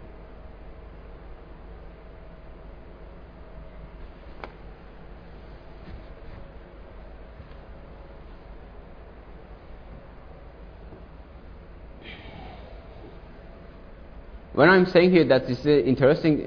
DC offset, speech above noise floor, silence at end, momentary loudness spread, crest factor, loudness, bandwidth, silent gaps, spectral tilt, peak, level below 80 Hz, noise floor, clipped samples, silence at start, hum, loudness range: under 0.1%; 26 dB; 0 s; 28 LU; 24 dB; -19 LUFS; 5.4 kHz; none; -8.5 dB/octave; -4 dBFS; -44 dBFS; -44 dBFS; under 0.1%; 0 s; none; 24 LU